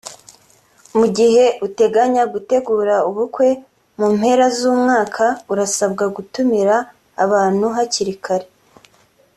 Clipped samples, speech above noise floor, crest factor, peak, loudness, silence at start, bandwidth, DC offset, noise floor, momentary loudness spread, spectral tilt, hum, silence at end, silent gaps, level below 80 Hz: under 0.1%; 39 dB; 14 dB; -2 dBFS; -16 LUFS; 0.05 s; 13 kHz; under 0.1%; -55 dBFS; 8 LU; -4 dB/octave; none; 0.9 s; none; -60 dBFS